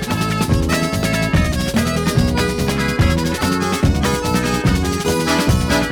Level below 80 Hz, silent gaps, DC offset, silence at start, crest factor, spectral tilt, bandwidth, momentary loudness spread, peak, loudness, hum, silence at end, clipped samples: -26 dBFS; none; under 0.1%; 0 s; 14 dB; -5 dB/octave; over 20 kHz; 2 LU; -4 dBFS; -17 LUFS; none; 0 s; under 0.1%